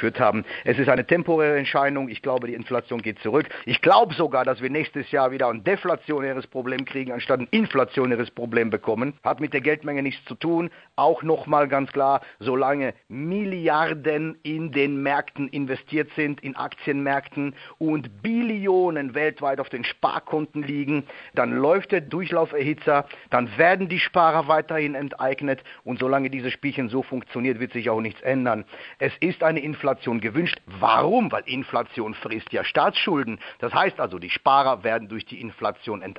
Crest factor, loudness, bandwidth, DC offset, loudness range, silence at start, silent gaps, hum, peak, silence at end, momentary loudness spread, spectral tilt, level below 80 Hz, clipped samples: 22 dB; -24 LUFS; 5.6 kHz; under 0.1%; 4 LU; 0 s; none; none; -2 dBFS; 0.05 s; 10 LU; -8.5 dB/octave; -66 dBFS; under 0.1%